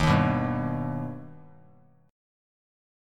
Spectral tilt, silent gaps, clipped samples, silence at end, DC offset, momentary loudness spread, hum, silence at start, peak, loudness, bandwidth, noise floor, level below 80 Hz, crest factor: -7 dB/octave; none; under 0.1%; 0.95 s; under 0.1%; 19 LU; none; 0 s; -10 dBFS; -28 LUFS; 11.5 kHz; -58 dBFS; -46 dBFS; 20 dB